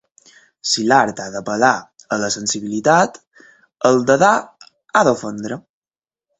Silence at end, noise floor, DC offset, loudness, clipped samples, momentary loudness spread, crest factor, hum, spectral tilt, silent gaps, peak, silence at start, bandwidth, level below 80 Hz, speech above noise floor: 0.8 s; under -90 dBFS; under 0.1%; -17 LUFS; under 0.1%; 13 LU; 18 dB; none; -3.5 dB/octave; 3.27-3.31 s; 0 dBFS; 0.65 s; 8.4 kHz; -60 dBFS; over 74 dB